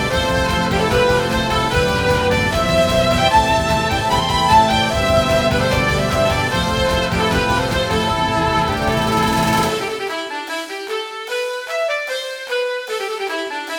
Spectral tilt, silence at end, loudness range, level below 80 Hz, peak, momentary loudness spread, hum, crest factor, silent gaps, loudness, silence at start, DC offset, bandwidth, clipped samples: -4.5 dB/octave; 0 s; 7 LU; -32 dBFS; -2 dBFS; 9 LU; none; 16 dB; none; -17 LUFS; 0 s; under 0.1%; 19 kHz; under 0.1%